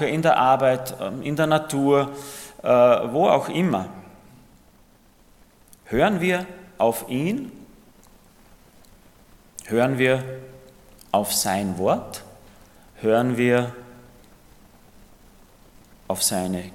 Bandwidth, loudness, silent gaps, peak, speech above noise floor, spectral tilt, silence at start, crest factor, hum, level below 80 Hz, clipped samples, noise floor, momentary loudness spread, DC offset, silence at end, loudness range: 17 kHz; -22 LUFS; none; -4 dBFS; 34 dB; -5 dB/octave; 0 s; 20 dB; none; -54 dBFS; under 0.1%; -55 dBFS; 19 LU; under 0.1%; 0 s; 7 LU